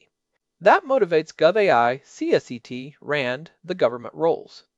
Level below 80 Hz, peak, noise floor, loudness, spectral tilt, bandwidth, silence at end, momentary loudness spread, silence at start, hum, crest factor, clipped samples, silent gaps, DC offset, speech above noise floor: -70 dBFS; -4 dBFS; -78 dBFS; -21 LUFS; -5.5 dB/octave; 8 kHz; 0.35 s; 15 LU; 0.6 s; none; 18 dB; under 0.1%; none; under 0.1%; 57 dB